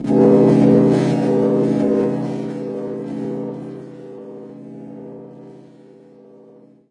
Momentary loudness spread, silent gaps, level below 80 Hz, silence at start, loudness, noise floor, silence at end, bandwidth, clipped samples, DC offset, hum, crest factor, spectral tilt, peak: 24 LU; none; -54 dBFS; 0 s; -17 LUFS; -46 dBFS; 1.3 s; 10.5 kHz; under 0.1%; under 0.1%; none; 18 dB; -9 dB/octave; -2 dBFS